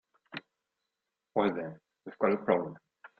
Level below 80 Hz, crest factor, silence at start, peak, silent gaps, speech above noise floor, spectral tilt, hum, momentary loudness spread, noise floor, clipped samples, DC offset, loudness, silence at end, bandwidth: -72 dBFS; 24 dB; 0.3 s; -10 dBFS; none; 56 dB; -9 dB/octave; none; 20 LU; -87 dBFS; under 0.1%; under 0.1%; -31 LUFS; 0.15 s; 5 kHz